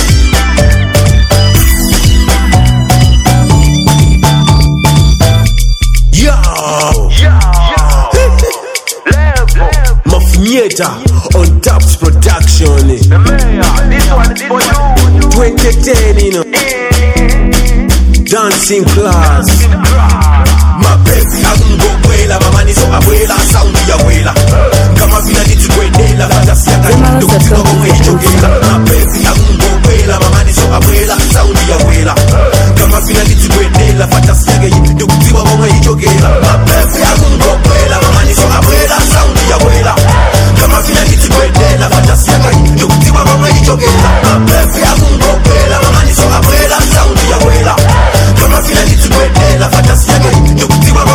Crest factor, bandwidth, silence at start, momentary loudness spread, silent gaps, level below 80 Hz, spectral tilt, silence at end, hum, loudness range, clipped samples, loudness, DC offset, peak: 6 dB; over 20 kHz; 0 s; 3 LU; none; -8 dBFS; -5 dB/octave; 0 s; none; 2 LU; 8%; -7 LUFS; under 0.1%; 0 dBFS